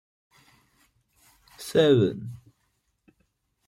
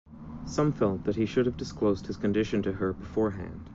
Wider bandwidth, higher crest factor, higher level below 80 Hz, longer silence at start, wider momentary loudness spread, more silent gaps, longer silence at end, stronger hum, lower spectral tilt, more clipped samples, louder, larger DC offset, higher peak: first, 16 kHz vs 7.8 kHz; about the same, 20 dB vs 16 dB; second, -66 dBFS vs -48 dBFS; first, 1.6 s vs 0.05 s; first, 22 LU vs 7 LU; neither; first, 1.3 s vs 0 s; neither; about the same, -6.5 dB/octave vs -7 dB/octave; neither; first, -22 LUFS vs -29 LUFS; neither; first, -8 dBFS vs -14 dBFS